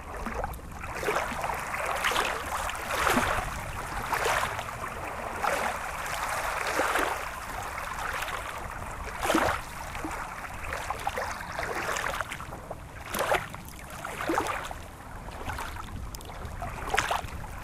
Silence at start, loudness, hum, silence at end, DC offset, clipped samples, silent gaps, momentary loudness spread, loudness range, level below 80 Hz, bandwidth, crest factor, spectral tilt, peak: 0 s; -31 LUFS; none; 0 s; under 0.1%; under 0.1%; none; 13 LU; 5 LU; -44 dBFS; 16 kHz; 28 dB; -3 dB/octave; -4 dBFS